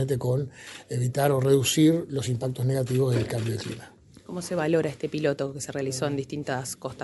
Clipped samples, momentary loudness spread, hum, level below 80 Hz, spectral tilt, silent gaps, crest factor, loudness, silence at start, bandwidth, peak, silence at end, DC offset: under 0.1%; 13 LU; none; -58 dBFS; -5.5 dB/octave; none; 18 dB; -26 LUFS; 0 s; 12 kHz; -8 dBFS; 0 s; under 0.1%